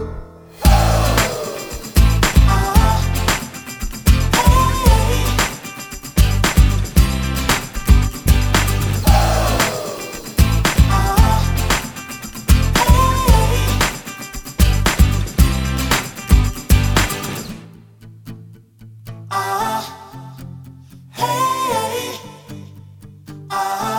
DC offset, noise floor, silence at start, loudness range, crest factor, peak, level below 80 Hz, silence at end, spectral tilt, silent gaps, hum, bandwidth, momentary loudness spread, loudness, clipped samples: under 0.1%; -41 dBFS; 0 s; 8 LU; 16 dB; 0 dBFS; -18 dBFS; 0 s; -4.5 dB/octave; none; none; over 20 kHz; 18 LU; -17 LUFS; under 0.1%